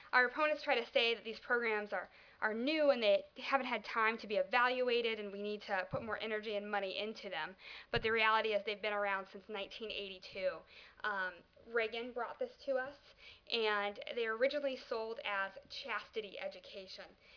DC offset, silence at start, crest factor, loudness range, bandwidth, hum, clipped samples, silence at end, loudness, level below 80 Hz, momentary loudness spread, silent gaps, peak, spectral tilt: under 0.1%; 0 s; 22 dB; 7 LU; 5.4 kHz; none; under 0.1%; 0 s; -37 LUFS; -68 dBFS; 14 LU; none; -16 dBFS; -4.5 dB/octave